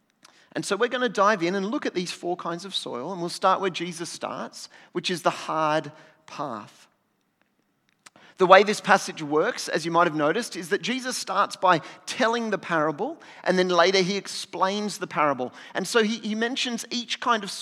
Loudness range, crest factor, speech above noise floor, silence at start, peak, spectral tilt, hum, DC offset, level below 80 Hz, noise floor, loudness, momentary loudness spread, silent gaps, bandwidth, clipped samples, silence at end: 8 LU; 26 dB; 46 dB; 0.55 s; 0 dBFS; -3.5 dB/octave; none; under 0.1%; -86 dBFS; -71 dBFS; -25 LUFS; 12 LU; none; 14.5 kHz; under 0.1%; 0 s